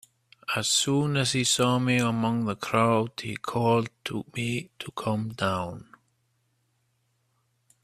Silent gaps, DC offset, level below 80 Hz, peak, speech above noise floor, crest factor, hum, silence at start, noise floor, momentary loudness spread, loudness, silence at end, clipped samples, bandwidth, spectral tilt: none; under 0.1%; -64 dBFS; -6 dBFS; 46 dB; 22 dB; none; 0.5 s; -72 dBFS; 11 LU; -26 LUFS; 2 s; under 0.1%; 15 kHz; -4 dB/octave